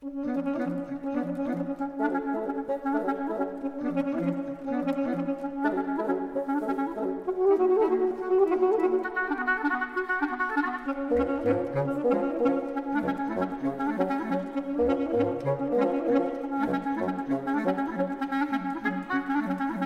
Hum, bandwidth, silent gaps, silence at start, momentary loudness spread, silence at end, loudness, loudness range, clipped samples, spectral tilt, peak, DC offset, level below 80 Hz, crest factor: none; 6.6 kHz; none; 0 s; 6 LU; 0 s; -28 LUFS; 4 LU; under 0.1%; -8 dB/octave; -12 dBFS; under 0.1%; -56 dBFS; 16 dB